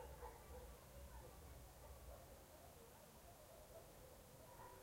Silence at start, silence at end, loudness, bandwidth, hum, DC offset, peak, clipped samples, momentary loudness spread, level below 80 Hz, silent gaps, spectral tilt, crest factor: 0 s; 0 s; -61 LUFS; 16 kHz; none; under 0.1%; -42 dBFS; under 0.1%; 4 LU; -64 dBFS; none; -4.5 dB/octave; 18 dB